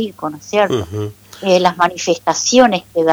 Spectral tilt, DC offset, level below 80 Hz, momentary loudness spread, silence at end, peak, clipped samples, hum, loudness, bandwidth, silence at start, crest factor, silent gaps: -4 dB/octave; under 0.1%; -50 dBFS; 14 LU; 0 s; -2 dBFS; under 0.1%; none; -15 LUFS; over 20 kHz; 0 s; 14 dB; none